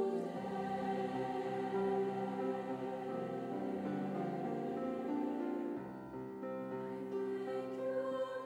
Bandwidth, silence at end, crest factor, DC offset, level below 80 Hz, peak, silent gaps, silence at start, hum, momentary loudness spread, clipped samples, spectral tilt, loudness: 11.5 kHz; 0 s; 14 dB; under 0.1%; -76 dBFS; -26 dBFS; none; 0 s; none; 6 LU; under 0.1%; -7.5 dB/octave; -40 LUFS